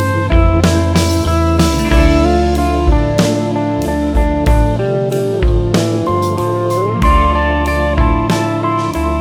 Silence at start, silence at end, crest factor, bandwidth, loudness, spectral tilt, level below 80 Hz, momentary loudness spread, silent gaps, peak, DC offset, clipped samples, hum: 0 s; 0 s; 12 dB; 16 kHz; -14 LUFS; -6.5 dB/octave; -18 dBFS; 4 LU; none; 0 dBFS; under 0.1%; under 0.1%; none